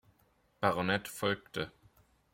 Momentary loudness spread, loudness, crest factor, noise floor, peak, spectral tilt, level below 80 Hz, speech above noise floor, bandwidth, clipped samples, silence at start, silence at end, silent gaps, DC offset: 9 LU; -34 LUFS; 24 dB; -71 dBFS; -12 dBFS; -4.5 dB/octave; -68 dBFS; 37 dB; 16.5 kHz; under 0.1%; 0.6 s; 0.65 s; none; under 0.1%